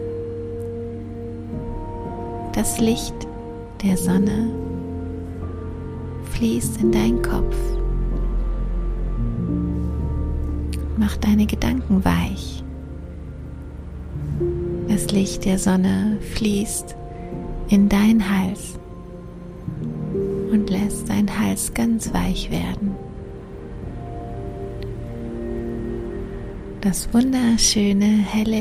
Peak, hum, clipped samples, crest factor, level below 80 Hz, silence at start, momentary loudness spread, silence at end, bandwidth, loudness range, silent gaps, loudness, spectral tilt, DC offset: -2 dBFS; none; under 0.1%; 20 dB; -30 dBFS; 0 s; 16 LU; 0 s; 15.5 kHz; 6 LU; none; -22 LUFS; -5.5 dB/octave; under 0.1%